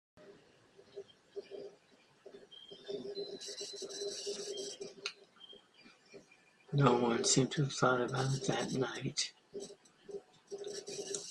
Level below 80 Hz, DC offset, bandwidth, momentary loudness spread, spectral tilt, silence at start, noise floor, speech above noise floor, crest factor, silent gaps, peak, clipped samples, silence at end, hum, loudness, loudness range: -74 dBFS; under 0.1%; 12 kHz; 24 LU; -4 dB/octave; 0.15 s; -67 dBFS; 34 dB; 26 dB; none; -12 dBFS; under 0.1%; 0 s; none; -36 LUFS; 14 LU